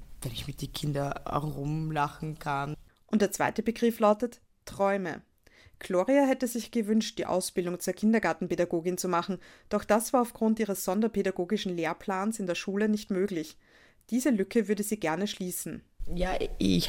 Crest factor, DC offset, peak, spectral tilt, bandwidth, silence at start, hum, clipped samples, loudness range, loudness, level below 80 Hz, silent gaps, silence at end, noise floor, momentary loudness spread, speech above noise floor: 18 dB; under 0.1%; -10 dBFS; -5 dB/octave; 17 kHz; 0 s; none; under 0.1%; 3 LU; -30 LUFS; -48 dBFS; none; 0 s; -59 dBFS; 11 LU; 30 dB